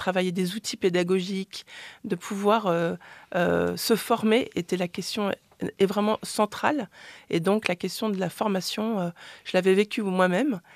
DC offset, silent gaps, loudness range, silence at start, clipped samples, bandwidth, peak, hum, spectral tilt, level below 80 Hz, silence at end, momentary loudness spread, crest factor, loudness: under 0.1%; none; 2 LU; 0 s; under 0.1%; 14.5 kHz; -4 dBFS; none; -5 dB/octave; -66 dBFS; 0.15 s; 11 LU; 22 dB; -26 LUFS